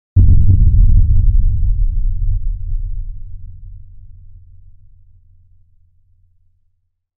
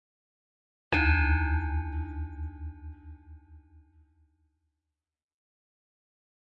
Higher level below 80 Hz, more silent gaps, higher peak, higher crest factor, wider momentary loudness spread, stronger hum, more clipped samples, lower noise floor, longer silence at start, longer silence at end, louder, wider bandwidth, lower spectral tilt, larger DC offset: first, -16 dBFS vs -38 dBFS; neither; first, 0 dBFS vs -14 dBFS; second, 14 dB vs 20 dB; about the same, 24 LU vs 22 LU; neither; neither; second, -64 dBFS vs -87 dBFS; second, 0.15 s vs 0.9 s; about the same, 2.85 s vs 2.8 s; first, -16 LUFS vs -29 LUFS; second, 0.6 kHz vs 5.6 kHz; first, -20 dB/octave vs -8 dB/octave; neither